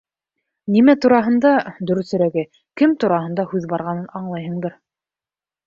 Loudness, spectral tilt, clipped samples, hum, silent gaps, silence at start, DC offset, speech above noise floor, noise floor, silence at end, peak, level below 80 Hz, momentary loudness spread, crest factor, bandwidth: -18 LUFS; -8 dB/octave; under 0.1%; none; none; 0.65 s; under 0.1%; over 73 dB; under -90 dBFS; 0.95 s; -2 dBFS; -62 dBFS; 14 LU; 18 dB; 7.4 kHz